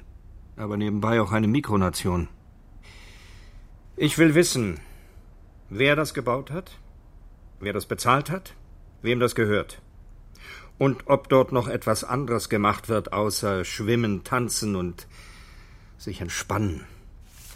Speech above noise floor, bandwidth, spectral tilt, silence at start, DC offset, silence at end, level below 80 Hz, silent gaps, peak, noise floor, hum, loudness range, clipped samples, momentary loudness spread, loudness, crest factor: 24 dB; 16 kHz; -5 dB/octave; 0 s; under 0.1%; 0 s; -46 dBFS; none; -4 dBFS; -48 dBFS; none; 4 LU; under 0.1%; 17 LU; -24 LUFS; 22 dB